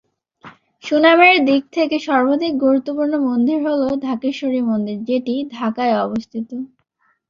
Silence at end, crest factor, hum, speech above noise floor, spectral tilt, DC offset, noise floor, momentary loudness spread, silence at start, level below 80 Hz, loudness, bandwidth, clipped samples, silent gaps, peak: 0.65 s; 16 dB; none; 27 dB; -5.5 dB/octave; under 0.1%; -44 dBFS; 14 LU; 0.45 s; -62 dBFS; -17 LUFS; 7.4 kHz; under 0.1%; none; -2 dBFS